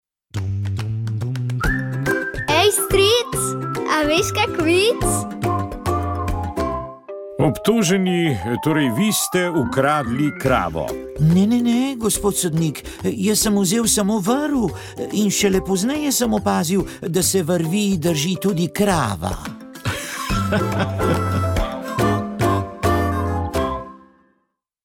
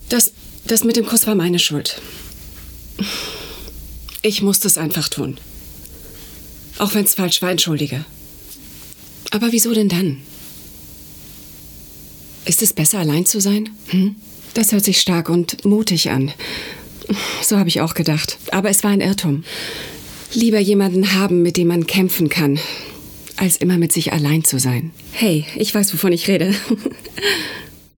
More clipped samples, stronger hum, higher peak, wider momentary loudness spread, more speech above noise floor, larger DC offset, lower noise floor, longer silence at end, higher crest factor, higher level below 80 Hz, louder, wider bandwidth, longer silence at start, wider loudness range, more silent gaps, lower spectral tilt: neither; neither; second, -4 dBFS vs 0 dBFS; second, 9 LU vs 21 LU; first, 52 dB vs 21 dB; neither; first, -71 dBFS vs -38 dBFS; first, 0.9 s vs 0.25 s; about the same, 16 dB vs 18 dB; first, -36 dBFS vs -46 dBFS; second, -20 LUFS vs -16 LUFS; second, 17.5 kHz vs 19.5 kHz; first, 0.35 s vs 0 s; about the same, 3 LU vs 5 LU; neither; about the same, -4.5 dB/octave vs -4 dB/octave